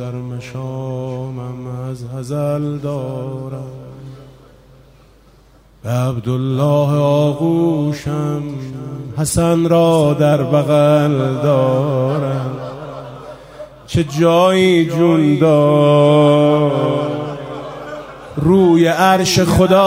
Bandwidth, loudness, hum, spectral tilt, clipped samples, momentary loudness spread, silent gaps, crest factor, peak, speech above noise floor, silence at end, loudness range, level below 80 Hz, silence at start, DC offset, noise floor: 16 kHz; -15 LUFS; none; -6.5 dB/octave; under 0.1%; 17 LU; none; 14 dB; 0 dBFS; 33 dB; 0 s; 12 LU; -42 dBFS; 0 s; under 0.1%; -47 dBFS